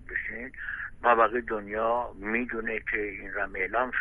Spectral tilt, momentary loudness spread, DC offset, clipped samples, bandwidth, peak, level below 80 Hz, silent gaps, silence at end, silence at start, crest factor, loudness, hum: -7.5 dB/octave; 12 LU; under 0.1%; under 0.1%; 3.8 kHz; -10 dBFS; -50 dBFS; none; 0 s; 0 s; 20 dB; -29 LUFS; none